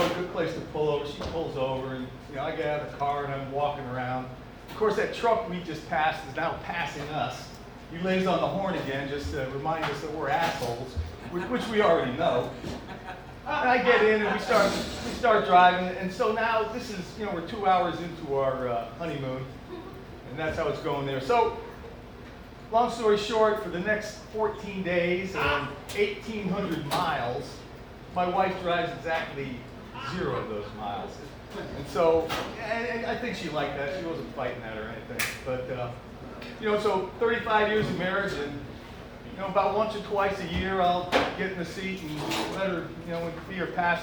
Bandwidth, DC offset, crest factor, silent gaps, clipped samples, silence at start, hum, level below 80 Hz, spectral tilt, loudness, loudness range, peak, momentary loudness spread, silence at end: over 20 kHz; under 0.1%; 22 dB; none; under 0.1%; 0 s; none; -50 dBFS; -5 dB/octave; -28 LUFS; 7 LU; -8 dBFS; 16 LU; 0 s